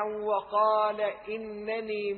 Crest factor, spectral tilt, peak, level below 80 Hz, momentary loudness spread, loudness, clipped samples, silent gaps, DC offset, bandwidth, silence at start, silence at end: 16 dB; -8 dB/octave; -14 dBFS; -68 dBFS; 11 LU; -29 LUFS; under 0.1%; none; under 0.1%; 4.5 kHz; 0 s; 0 s